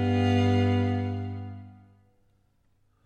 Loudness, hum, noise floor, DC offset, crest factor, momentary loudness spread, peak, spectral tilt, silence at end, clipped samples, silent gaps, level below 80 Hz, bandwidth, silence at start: -26 LUFS; none; -67 dBFS; under 0.1%; 16 dB; 17 LU; -12 dBFS; -8 dB/octave; 1.35 s; under 0.1%; none; -60 dBFS; 8.2 kHz; 0 s